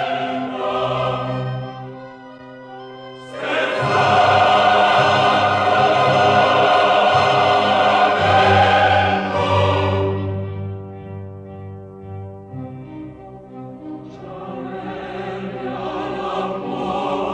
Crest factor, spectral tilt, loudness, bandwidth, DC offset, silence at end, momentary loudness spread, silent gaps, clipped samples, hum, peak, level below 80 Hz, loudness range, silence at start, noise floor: 16 dB; -5.5 dB/octave; -17 LUFS; 10 kHz; under 0.1%; 0 s; 22 LU; none; under 0.1%; none; -2 dBFS; -52 dBFS; 19 LU; 0 s; -38 dBFS